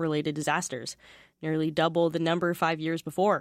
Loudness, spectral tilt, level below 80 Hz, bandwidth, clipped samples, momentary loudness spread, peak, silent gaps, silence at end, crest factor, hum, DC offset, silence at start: -28 LUFS; -5 dB/octave; -68 dBFS; 16 kHz; under 0.1%; 11 LU; -12 dBFS; none; 0 s; 16 dB; none; under 0.1%; 0 s